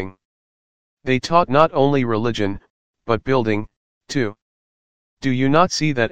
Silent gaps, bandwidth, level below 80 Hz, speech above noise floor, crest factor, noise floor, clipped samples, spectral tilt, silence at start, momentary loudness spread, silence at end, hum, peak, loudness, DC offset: 0.25-0.97 s, 2.70-2.94 s, 3.76-4.01 s, 4.42-5.17 s; 9.4 kHz; -48 dBFS; over 72 dB; 20 dB; under -90 dBFS; under 0.1%; -6 dB/octave; 0 s; 14 LU; 0 s; none; 0 dBFS; -19 LUFS; 2%